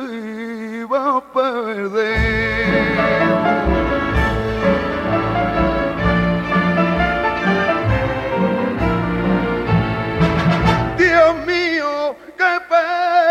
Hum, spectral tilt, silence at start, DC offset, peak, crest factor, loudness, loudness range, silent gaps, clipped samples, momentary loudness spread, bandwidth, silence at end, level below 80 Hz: none; -7 dB/octave; 0 s; under 0.1%; 0 dBFS; 16 dB; -17 LUFS; 2 LU; none; under 0.1%; 5 LU; 9.8 kHz; 0 s; -30 dBFS